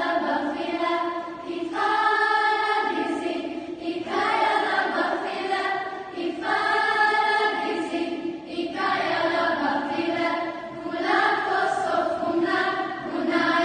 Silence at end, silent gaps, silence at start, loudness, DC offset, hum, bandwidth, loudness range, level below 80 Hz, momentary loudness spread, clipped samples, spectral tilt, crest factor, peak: 0 s; none; 0 s; -24 LUFS; under 0.1%; none; 9.6 kHz; 2 LU; -64 dBFS; 10 LU; under 0.1%; -4 dB/octave; 16 dB; -8 dBFS